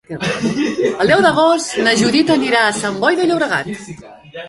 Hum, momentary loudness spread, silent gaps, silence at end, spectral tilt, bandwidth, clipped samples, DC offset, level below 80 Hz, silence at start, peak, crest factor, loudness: none; 10 LU; none; 0 s; -4 dB/octave; 11.5 kHz; under 0.1%; under 0.1%; -52 dBFS; 0.1 s; 0 dBFS; 14 dB; -14 LUFS